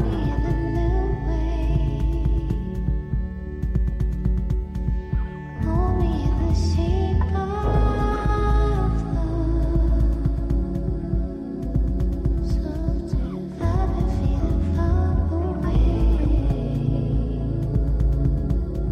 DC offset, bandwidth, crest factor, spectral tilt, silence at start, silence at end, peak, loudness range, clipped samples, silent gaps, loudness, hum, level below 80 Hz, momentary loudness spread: under 0.1%; 6.4 kHz; 12 dB; -9 dB/octave; 0 s; 0 s; -10 dBFS; 3 LU; under 0.1%; none; -24 LUFS; none; -24 dBFS; 6 LU